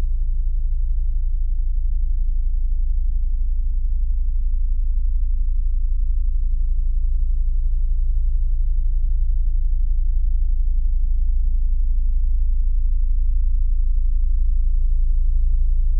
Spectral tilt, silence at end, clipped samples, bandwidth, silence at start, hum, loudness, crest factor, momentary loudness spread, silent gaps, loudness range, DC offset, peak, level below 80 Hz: -17.5 dB/octave; 0 s; under 0.1%; 0.3 kHz; 0 s; none; -25 LUFS; 8 dB; 2 LU; none; 2 LU; under 0.1%; -8 dBFS; -16 dBFS